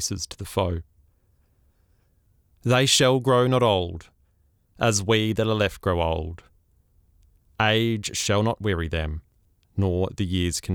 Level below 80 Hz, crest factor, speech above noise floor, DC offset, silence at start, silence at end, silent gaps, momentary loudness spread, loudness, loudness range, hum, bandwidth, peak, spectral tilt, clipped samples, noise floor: -46 dBFS; 18 dB; 41 dB; under 0.1%; 0 s; 0 s; none; 14 LU; -23 LUFS; 4 LU; none; 18 kHz; -6 dBFS; -4.5 dB/octave; under 0.1%; -64 dBFS